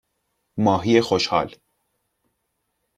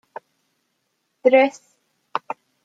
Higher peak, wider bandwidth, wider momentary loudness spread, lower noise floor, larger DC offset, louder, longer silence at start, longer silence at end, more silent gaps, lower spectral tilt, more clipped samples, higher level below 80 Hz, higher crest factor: about the same, -4 dBFS vs -4 dBFS; first, 12 kHz vs 7.8 kHz; second, 13 LU vs 25 LU; about the same, -75 dBFS vs -73 dBFS; neither; about the same, -20 LUFS vs -20 LUFS; second, 0.55 s vs 1.25 s; first, 1.5 s vs 0.3 s; neither; first, -5.5 dB/octave vs -4 dB/octave; neither; first, -58 dBFS vs -82 dBFS; about the same, 20 dB vs 20 dB